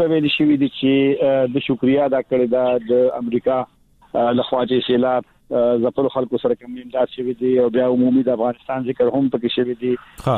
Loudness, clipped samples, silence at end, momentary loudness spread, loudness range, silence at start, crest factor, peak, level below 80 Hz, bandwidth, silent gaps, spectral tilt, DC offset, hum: -19 LUFS; under 0.1%; 0 s; 7 LU; 2 LU; 0 s; 12 dB; -6 dBFS; -54 dBFS; 4.4 kHz; none; -8 dB/octave; under 0.1%; none